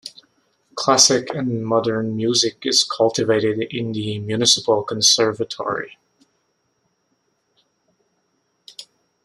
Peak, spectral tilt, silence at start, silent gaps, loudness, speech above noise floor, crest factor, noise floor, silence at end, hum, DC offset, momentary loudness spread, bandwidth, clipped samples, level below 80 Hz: 0 dBFS; -2.5 dB/octave; 0.05 s; none; -18 LUFS; 49 dB; 22 dB; -69 dBFS; 0.4 s; none; under 0.1%; 21 LU; 13.5 kHz; under 0.1%; -64 dBFS